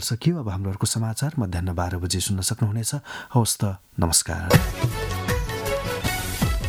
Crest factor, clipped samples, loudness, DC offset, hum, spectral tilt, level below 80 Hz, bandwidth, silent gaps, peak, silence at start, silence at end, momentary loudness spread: 20 dB; under 0.1%; -24 LUFS; under 0.1%; none; -4.5 dB/octave; -36 dBFS; 18.5 kHz; none; -2 dBFS; 0 s; 0 s; 7 LU